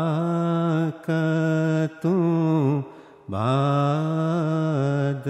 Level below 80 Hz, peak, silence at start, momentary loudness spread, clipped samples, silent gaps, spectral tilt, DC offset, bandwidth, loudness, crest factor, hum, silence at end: -68 dBFS; -10 dBFS; 0 s; 4 LU; under 0.1%; none; -8.5 dB/octave; under 0.1%; 8.4 kHz; -23 LUFS; 14 dB; none; 0 s